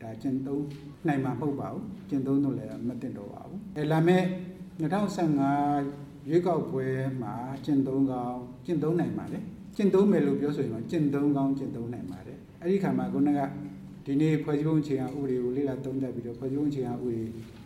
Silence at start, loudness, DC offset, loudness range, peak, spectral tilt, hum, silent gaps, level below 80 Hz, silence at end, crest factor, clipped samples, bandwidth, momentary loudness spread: 0 s; -29 LUFS; under 0.1%; 3 LU; -10 dBFS; -8.5 dB/octave; none; none; -60 dBFS; 0 s; 18 dB; under 0.1%; 13.5 kHz; 13 LU